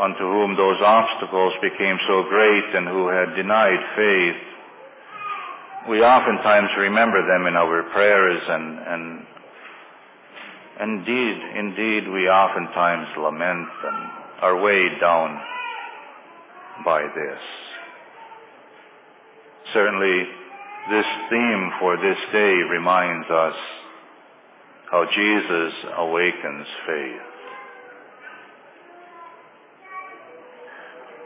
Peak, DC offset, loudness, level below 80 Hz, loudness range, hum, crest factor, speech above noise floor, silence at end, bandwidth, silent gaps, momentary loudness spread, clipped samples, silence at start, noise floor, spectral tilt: -4 dBFS; under 0.1%; -20 LUFS; -68 dBFS; 11 LU; none; 18 dB; 30 dB; 0 s; 4 kHz; none; 22 LU; under 0.1%; 0 s; -49 dBFS; -8 dB/octave